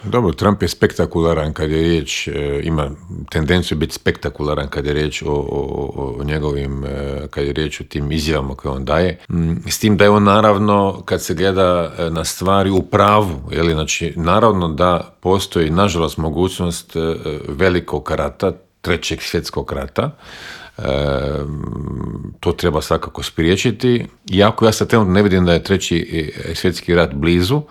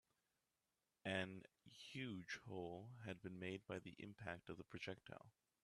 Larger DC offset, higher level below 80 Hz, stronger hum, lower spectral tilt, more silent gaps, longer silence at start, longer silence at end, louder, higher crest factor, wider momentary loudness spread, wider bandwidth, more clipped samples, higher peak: neither; first, -34 dBFS vs -84 dBFS; neither; about the same, -5.5 dB/octave vs -5.5 dB/octave; neither; second, 0 s vs 1.05 s; second, 0.05 s vs 0.35 s; first, -17 LUFS vs -52 LUFS; second, 16 dB vs 26 dB; about the same, 11 LU vs 12 LU; first, 16 kHz vs 13 kHz; neither; first, 0 dBFS vs -28 dBFS